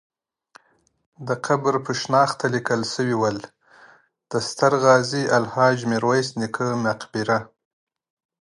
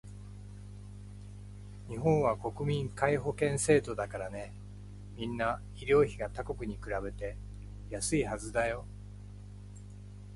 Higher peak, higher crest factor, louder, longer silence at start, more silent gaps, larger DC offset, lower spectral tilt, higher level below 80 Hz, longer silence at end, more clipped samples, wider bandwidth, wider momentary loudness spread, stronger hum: first, -2 dBFS vs -12 dBFS; about the same, 22 dB vs 22 dB; first, -21 LUFS vs -33 LUFS; first, 1.2 s vs 0.05 s; neither; neither; about the same, -5 dB/octave vs -5.5 dB/octave; second, -64 dBFS vs -48 dBFS; first, 1 s vs 0 s; neither; about the same, 11.5 kHz vs 11.5 kHz; second, 9 LU vs 21 LU; second, none vs 50 Hz at -45 dBFS